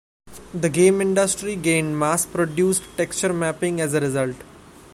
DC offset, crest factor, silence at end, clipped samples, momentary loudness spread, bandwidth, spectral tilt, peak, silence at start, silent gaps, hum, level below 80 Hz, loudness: under 0.1%; 18 dB; 0.35 s; under 0.1%; 8 LU; 15.5 kHz; -4.5 dB/octave; -4 dBFS; 0.25 s; none; none; -52 dBFS; -21 LUFS